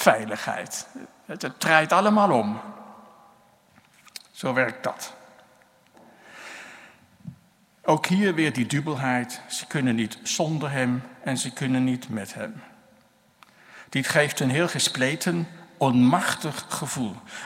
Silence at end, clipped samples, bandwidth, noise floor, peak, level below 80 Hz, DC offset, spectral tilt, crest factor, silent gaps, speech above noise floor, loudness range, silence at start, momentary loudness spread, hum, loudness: 0 s; under 0.1%; 16 kHz; -59 dBFS; 0 dBFS; -70 dBFS; under 0.1%; -4.5 dB/octave; 26 dB; none; 35 dB; 9 LU; 0 s; 21 LU; none; -24 LUFS